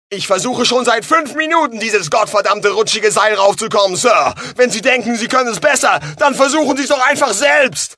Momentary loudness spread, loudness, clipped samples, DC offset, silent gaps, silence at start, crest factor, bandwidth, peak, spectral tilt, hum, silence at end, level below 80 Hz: 4 LU; -13 LUFS; under 0.1%; under 0.1%; none; 0.1 s; 14 dB; 11 kHz; 0 dBFS; -2 dB/octave; none; 0.05 s; -58 dBFS